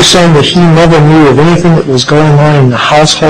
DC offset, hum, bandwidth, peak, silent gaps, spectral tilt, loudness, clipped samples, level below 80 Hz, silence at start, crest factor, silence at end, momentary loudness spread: under 0.1%; none; 12 kHz; 0 dBFS; none; -5 dB/octave; -5 LUFS; 0.5%; -28 dBFS; 0 s; 4 dB; 0 s; 3 LU